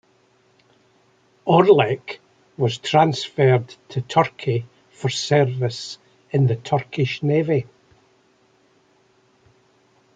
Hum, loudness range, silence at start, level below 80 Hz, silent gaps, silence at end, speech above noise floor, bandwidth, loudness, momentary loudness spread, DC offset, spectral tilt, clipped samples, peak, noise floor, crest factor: none; 5 LU; 1.45 s; -64 dBFS; none; 2.55 s; 40 dB; 9 kHz; -20 LUFS; 14 LU; under 0.1%; -6 dB/octave; under 0.1%; -2 dBFS; -60 dBFS; 20 dB